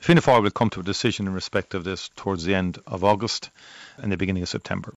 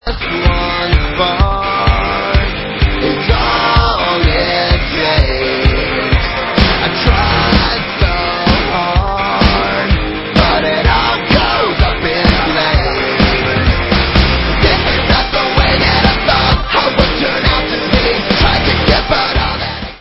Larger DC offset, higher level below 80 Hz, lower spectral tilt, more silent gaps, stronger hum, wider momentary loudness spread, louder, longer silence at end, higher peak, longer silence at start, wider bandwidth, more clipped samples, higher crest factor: neither; second, -52 dBFS vs -18 dBFS; second, -5.5 dB/octave vs -7.5 dB/octave; neither; neither; first, 12 LU vs 4 LU; second, -24 LUFS vs -12 LUFS; about the same, 0.05 s vs 0 s; second, -6 dBFS vs 0 dBFS; about the same, 0 s vs 0.05 s; first, 9.8 kHz vs 7.2 kHz; neither; first, 18 dB vs 12 dB